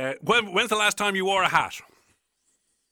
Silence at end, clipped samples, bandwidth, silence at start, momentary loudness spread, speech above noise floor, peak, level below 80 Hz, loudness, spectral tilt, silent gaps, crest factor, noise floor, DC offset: 1.1 s; under 0.1%; 20 kHz; 0 s; 6 LU; 48 dB; -6 dBFS; -62 dBFS; -22 LUFS; -2.5 dB/octave; none; 20 dB; -72 dBFS; under 0.1%